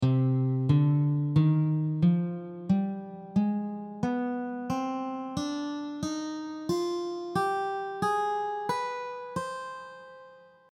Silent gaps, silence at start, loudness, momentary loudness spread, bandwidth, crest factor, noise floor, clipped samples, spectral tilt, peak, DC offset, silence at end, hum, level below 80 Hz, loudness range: none; 0 s; -29 LUFS; 12 LU; 12 kHz; 16 dB; -53 dBFS; under 0.1%; -7.5 dB/octave; -12 dBFS; under 0.1%; 0.3 s; none; -62 dBFS; 6 LU